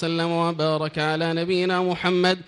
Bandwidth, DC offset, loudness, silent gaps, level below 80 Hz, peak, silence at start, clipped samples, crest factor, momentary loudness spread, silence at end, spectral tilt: 11 kHz; under 0.1%; -23 LUFS; none; -62 dBFS; -8 dBFS; 0 s; under 0.1%; 14 dB; 3 LU; 0.05 s; -6 dB/octave